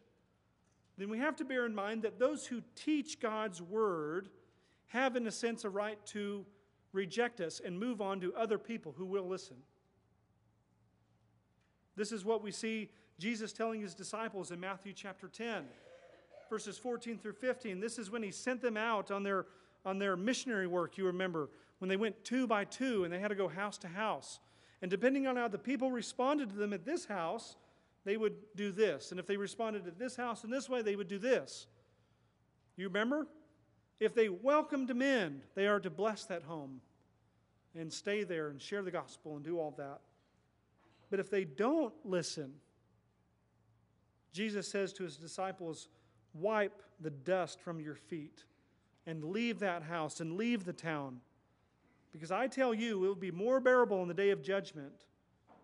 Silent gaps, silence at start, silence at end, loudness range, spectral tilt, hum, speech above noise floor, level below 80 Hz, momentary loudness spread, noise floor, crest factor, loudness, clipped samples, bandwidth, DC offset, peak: none; 1 s; 0.1 s; 8 LU; -5 dB/octave; none; 37 dB; -84 dBFS; 13 LU; -75 dBFS; 22 dB; -38 LUFS; under 0.1%; 11 kHz; under 0.1%; -16 dBFS